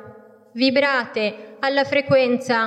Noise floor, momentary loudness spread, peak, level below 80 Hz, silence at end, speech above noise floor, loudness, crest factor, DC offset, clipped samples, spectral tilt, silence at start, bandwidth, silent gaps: -45 dBFS; 8 LU; -6 dBFS; -72 dBFS; 0 s; 26 dB; -20 LUFS; 14 dB; under 0.1%; under 0.1%; -5 dB/octave; 0.05 s; 9.4 kHz; none